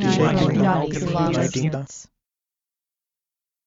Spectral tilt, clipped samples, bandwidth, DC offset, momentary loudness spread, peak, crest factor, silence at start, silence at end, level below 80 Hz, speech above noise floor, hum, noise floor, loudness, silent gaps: -6 dB/octave; under 0.1%; 7.8 kHz; under 0.1%; 13 LU; -6 dBFS; 18 dB; 0 s; 1.65 s; -48 dBFS; 69 dB; none; -89 dBFS; -21 LUFS; none